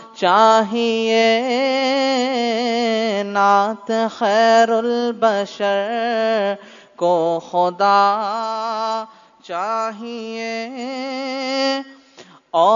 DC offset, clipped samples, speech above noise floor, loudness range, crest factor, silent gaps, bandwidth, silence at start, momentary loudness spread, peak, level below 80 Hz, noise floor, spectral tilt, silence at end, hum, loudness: under 0.1%; under 0.1%; 28 dB; 7 LU; 16 dB; none; 7.4 kHz; 0 s; 12 LU; -2 dBFS; -72 dBFS; -46 dBFS; -4 dB/octave; 0 s; none; -18 LUFS